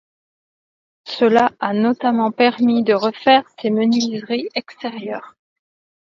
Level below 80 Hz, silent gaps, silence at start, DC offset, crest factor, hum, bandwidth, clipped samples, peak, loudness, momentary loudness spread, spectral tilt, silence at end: -66 dBFS; none; 1.05 s; under 0.1%; 18 dB; none; 7.2 kHz; under 0.1%; 0 dBFS; -17 LUFS; 14 LU; -5 dB/octave; 0.85 s